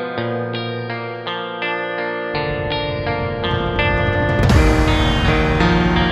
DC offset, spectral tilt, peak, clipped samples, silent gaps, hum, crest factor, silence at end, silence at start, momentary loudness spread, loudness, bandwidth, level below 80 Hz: under 0.1%; -6.5 dB/octave; 0 dBFS; under 0.1%; none; none; 16 dB; 0 s; 0 s; 10 LU; -18 LUFS; 12.5 kHz; -24 dBFS